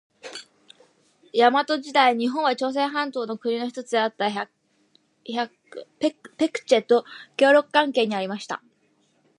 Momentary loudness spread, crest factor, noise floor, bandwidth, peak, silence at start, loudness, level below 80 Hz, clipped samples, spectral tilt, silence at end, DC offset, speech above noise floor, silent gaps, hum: 17 LU; 20 dB; -65 dBFS; 11.5 kHz; -4 dBFS; 0.25 s; -23 LUFS; -80 dBFS; under 0.1%; -4 dB/octave; 0.85 s; under 0.1%; 43 dB; none; none